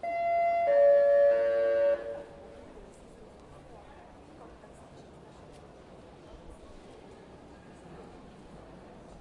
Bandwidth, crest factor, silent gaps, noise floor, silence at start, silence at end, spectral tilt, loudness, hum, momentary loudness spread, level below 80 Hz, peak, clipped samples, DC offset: 5.8 kHz; 16 dB; none; -51 dBFS; 0.05 s; 0 s; -6 dB/octave; -25 LUFS; none; 29 LU; -60 dBFS; -16 dBFS; under 0.1%; under 0.1%